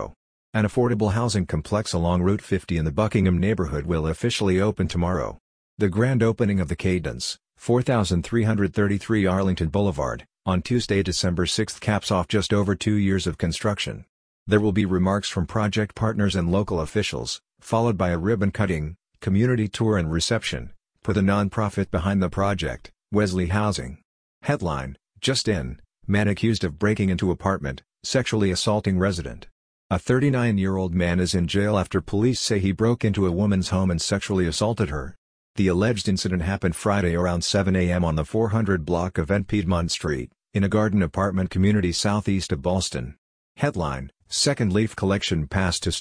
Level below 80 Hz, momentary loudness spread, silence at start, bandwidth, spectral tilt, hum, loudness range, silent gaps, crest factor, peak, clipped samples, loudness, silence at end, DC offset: -42 dBFS; 7 LU; 0 s; 10.5 kHz; -5.5 dB/octave; none; 2 LU; 0.16-0.53 s, 5.40-5.77 s, 14.09-14.46 s, 24.05-24.41 s, 29.52-29.90 s, 35.18-35.54 s, 43.18-43.55 s; 18 dB; -6 dBFS; under 0.1%; -23 LUFS; 0 s; under 0.1%